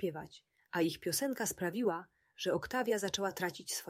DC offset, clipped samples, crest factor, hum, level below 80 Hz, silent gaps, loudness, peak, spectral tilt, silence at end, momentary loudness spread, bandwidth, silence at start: under 0.1%; under 0.1%; 16 dB; none; -70 dBFS; none; -36 LUFS; -20 dBFS; -3.5 dB/octave; 0 s; 7 LU; 16 kHz; 0 s